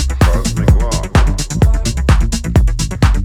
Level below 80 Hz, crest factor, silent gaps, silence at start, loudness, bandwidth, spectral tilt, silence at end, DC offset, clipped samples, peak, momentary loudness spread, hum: -14 dBFS; 12 dB; none; 0 s; -14 LUFS; 15 kHz; -5.5 dB/octave; 0 s; under 0.1%; under 0.1%; 0 dBFS; 2 LU; none